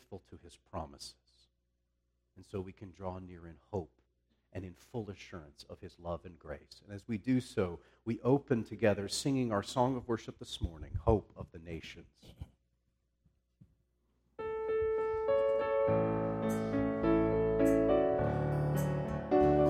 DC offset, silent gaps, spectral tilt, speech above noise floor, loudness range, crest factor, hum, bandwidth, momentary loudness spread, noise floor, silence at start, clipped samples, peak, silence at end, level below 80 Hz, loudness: under 0.1%; none; -6.5 dB/octave; 43 dB; 16 LU; 20 dB; none; 15.5 kHz; 20 LU; -80 dBFS; 0.1 s; under 0.1%; -14 dBFS; 0 s; -52 dBFS; -34 LUFS